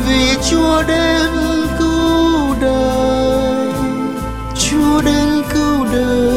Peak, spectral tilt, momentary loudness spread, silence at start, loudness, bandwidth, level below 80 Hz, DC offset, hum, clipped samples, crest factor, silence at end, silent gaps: -2 dBFS; -4.5 dB/octave; 5 LU; 0 s; -14 LUFS; 16 kHz; -26 dBFS; 1%; none; under 0.1%; 12 dB; 0 s; none